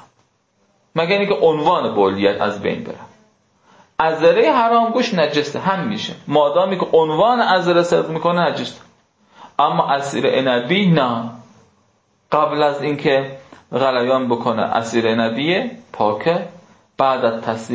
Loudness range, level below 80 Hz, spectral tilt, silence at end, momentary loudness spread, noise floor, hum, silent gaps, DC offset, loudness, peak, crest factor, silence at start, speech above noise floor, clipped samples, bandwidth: 3 LU; -60 dBFS; -6 dB/octave; 0 s; 10 LU; -62 dBFS; none; none; under 0.1%; -17 LUFS; -2 dBFS; 16 dB; 0.95 s; 45 dB; under 0.1%; 8 kHz